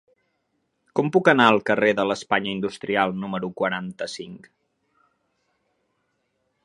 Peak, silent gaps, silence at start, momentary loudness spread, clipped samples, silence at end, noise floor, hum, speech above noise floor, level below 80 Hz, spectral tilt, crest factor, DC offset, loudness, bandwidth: 0 dBFS; none; 0.95 s; 15 LU; under 0.1%; 2.3 s; -73 dBFS; none; 51 dB; -66 dBFS; -5.5 dB/octave; 24 dB; under 0.1%; -22 LUFS; 11 kHz